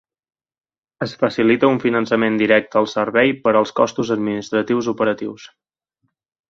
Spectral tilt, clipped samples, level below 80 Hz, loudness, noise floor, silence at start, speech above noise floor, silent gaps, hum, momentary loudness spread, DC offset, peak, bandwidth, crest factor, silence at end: -6 dB/octave; under 0.1%; -60 dBFS; -18 LUFS; -72 dBFS; 1 s; 54 dB; none; none; 6 LU; under 0.1%; 0 dBFS; 7.6 kHz; 18 dB; 1.05 s